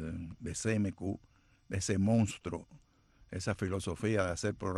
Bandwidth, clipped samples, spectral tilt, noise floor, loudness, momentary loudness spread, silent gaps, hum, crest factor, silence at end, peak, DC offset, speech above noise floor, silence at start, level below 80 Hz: 12.5 kHz; under 0.1%; -5.5 dB/octave; -65 dBFS; -35 LUFS; 13 LU; none; none; 16 dB; 0 s; -18 dBFS; under 0.1%; 31 dB; 0 s; -56 dBFS